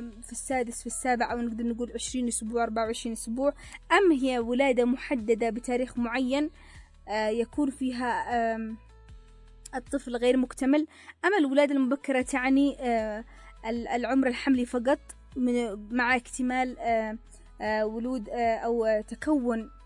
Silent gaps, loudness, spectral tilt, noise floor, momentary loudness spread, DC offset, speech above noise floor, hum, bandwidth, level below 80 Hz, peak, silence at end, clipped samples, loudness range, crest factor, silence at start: none; -28 LUFS; -4 dB/octave; -51 dBFS; 10 LU; under 0.1%; 23 dB; none; 11.5 kHz; -52 dBFS; -10 dBFS; 0 s; under 0.1%; 4 LU; 18 dB; 0 s